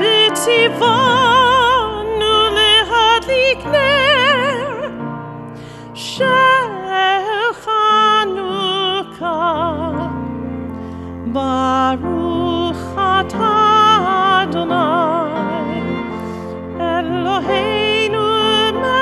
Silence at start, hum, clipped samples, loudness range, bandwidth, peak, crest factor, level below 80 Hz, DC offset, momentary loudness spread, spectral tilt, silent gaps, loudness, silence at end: 0 s; none; under 0.1%; 7 LU; 13.5 kHz; -2 dBFS; 14 dB; -44 dBFS; under 0.1%; 15 LU; -4 dB/octave; none; -14 LUFS; 0 s